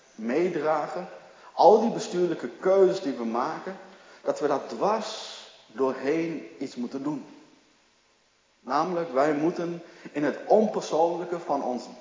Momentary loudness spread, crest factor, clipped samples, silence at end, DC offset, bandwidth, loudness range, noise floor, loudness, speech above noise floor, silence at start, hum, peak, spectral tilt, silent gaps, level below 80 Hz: 16 LU; 22 dB; under 0.1%; 0 s; under 0.1%; 7.6 kHz; 8 LU; -65 dBFS; -26 LUFS; 39 dB; 0.2 s; none; -4 dBFS; -5.5 dB/octave; none; -82 dBFS